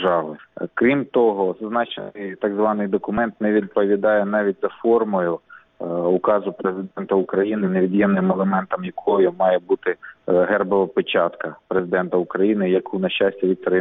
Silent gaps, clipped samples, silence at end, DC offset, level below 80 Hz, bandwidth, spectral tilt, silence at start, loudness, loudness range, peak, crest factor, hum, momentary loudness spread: none; under 0.1%; 0 s; under 0.1%; -62 dBFS; 3.9 kHz; -10 dB/octave; 0 s; -20 LUFS; 2 LU; -4 dBFS; 16 dB; none; 8 LU